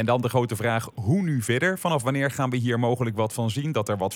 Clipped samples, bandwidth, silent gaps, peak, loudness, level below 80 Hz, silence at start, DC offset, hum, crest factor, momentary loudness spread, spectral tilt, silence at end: under 0.1%; 17.5 kHz; none; -8 dBFS; -25 LUFS; -62 dBFS; 0 s; under 0.1%; none; 16 dB; 3 LU; -6 dB/octave; 0 s